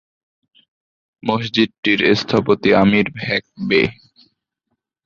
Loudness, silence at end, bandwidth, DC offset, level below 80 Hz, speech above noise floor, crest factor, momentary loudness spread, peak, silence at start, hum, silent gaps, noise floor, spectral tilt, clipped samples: -17 LUFS; 1.15 s; 7.2 kHz; under 0.1%; -50 dBFS; 58 dB; 18 dB; 8 LU; -2 dBFS; 1.25 s; none; 1.78-1.83 s; -75 dBFS; -6 dB/octave; under 0.1%